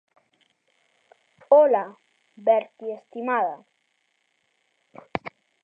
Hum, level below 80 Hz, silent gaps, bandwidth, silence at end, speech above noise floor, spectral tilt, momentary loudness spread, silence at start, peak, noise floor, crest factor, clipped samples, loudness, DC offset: none; -72 dBFS; none; 5.2 kHz; 0.45 s; 50 dB; -7.5 dB/octave; 20 LU; 1.5 s; -4 dBFS; -71 dBFS; 22 dB; under 0.1%; -23 LUFS; under 0.1%